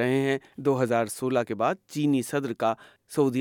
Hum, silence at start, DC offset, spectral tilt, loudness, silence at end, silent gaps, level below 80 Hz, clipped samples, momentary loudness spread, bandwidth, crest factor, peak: none; 0 s; under 0.1%; -6 dB/octave; -27 LUFS; 0 s; none; -74 dBFS; under 0.1%; 4 LU; 18 kHz; 14 dB; -12 dBFS